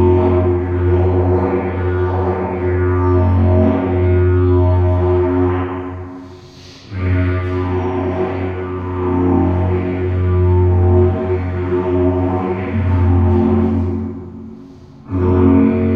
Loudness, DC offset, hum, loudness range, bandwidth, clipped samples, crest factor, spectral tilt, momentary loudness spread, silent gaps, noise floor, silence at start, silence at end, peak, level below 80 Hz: -16 LUFS; under 0.1%; none; 5 LU; 4.7 kHz; under 0.1%; 14 dB; -11 dB/octave; 10 LU; none; -37 dBFS; 0 s; 0 s; -2 dBFS; -32 dBFS